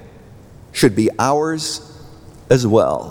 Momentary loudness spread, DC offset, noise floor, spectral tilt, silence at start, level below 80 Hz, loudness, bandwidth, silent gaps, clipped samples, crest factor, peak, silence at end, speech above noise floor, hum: 11 LU; under 0.1%; -41 dBFS; -5.5 dB/octave; 0 s; -46 dBFS; -17 LUFS; over 20 kHz; none; under 0.1%; 16 dB; -2 dBFS; 0 s; 26 dB; none